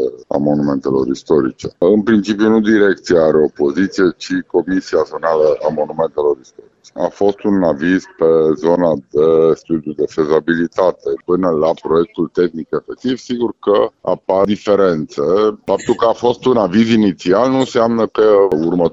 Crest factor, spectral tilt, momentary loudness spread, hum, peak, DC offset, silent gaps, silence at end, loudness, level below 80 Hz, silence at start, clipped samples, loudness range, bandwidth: 12 dB; -6.5 dB/octave; 7 LU; none; -2 dBFS; under 0.1%; none; 0 s; -15 LUFS; -48 dBFS; 0 s; under 0.1%; 3 LU; 8 kHz